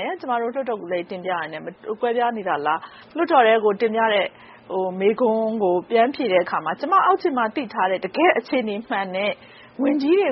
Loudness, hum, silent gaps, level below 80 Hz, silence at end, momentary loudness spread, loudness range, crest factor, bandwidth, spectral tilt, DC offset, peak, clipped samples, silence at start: -21 LUFS; none; none; -70 dBFS; 0 s; 10 LU; 2 LU; 18 dB; 5.8 kHz; -2.5 dB/octave; under 0.1%; -4 dBFS; under 0.1%; 0 s